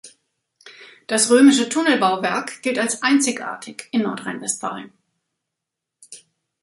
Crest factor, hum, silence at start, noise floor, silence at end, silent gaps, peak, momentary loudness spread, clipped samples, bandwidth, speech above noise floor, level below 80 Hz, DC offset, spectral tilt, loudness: 18 dB; none; 0.05 s; -83 dBFS; 0.45 s; none; -2 dBFS; 17 LU; under 0.1%; 11.5 kHz; 64 dB; -70 dBFS; under 0.1%; -2.5 dB/octave; -19 LUFS